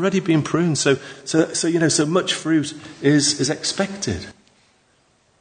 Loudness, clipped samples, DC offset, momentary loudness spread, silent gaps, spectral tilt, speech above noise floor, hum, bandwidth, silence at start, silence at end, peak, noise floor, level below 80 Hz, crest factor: -20 LUFS; under 0.1%; under 0.1%; 9 LU; none; -4 dB/octave; 41 dB; none; 9.6 kHz; 0 s; 1.1 s; -2 dBFS; -60 dBFS; -58 dBFS; 18 dB